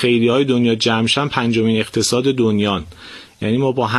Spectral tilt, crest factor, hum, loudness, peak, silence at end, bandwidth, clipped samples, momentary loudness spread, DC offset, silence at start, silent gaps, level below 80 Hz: -5 dB/octave; 16 dB; none; -16 LUFS; 0 dBFS; 0 s; 13 kHz; under 0.1%; 10 LU; under 0.1%; 0 s; none; -46 dBFS